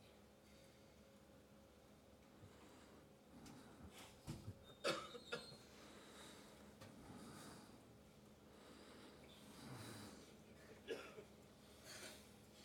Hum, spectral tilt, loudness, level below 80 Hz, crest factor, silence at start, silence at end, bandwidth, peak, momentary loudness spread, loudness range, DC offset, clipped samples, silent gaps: none; -4 dB/octave; -57 LUFS; -76 dBFS; 30 dB; 0 s; 0 s; 17 kHz; -28 dBFS; 15 LU; 12 LU; under 0.1%; under 0.1%; none